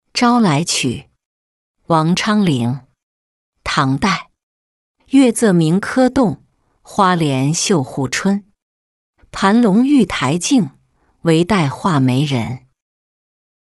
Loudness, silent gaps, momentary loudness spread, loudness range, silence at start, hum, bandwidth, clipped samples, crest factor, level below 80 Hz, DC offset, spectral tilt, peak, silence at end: -15 LUFS; 1.25-1.74 s, 3.03-3.52 s, 4.43-4.95 s, 8.62-9.13 s; 10 LU; 4 LU; 0.15 s; none; 12 kHz; under 0.1%; 14 dB; -48 dBFS; under 0.1%; -5 dB/octave; -2 dBFS; 1.15 s